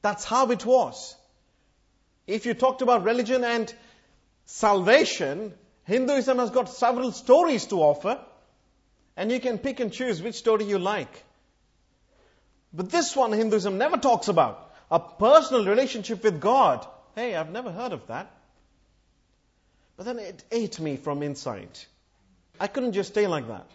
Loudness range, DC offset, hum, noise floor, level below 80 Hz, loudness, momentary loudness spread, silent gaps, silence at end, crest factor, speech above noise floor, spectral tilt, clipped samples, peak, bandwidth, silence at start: 12 LU; under 0.1%; none; -67 dBFS; -64 dBFS; -24 LUFS; 16 LU; none; 0.1 s; 22 dB; 43 dB; -4.5 dB/octave; under 0.1%; -2 dBFS; 8 kHz; 0.05 s